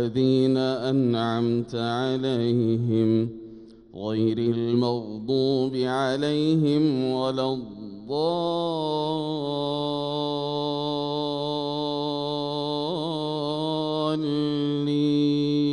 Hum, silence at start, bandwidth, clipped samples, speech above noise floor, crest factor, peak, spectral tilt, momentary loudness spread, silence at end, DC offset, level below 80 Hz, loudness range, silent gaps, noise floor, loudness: none; 0 s; 10.5 kHz; under 0.1%; 21 dB; 14 dB; -12 dBFS; -7.5 dB/octave; 6 LU; 0 s; under 0.1%; -60 dBFS; 3 LU; none; -45 dBFS; -25 LUFS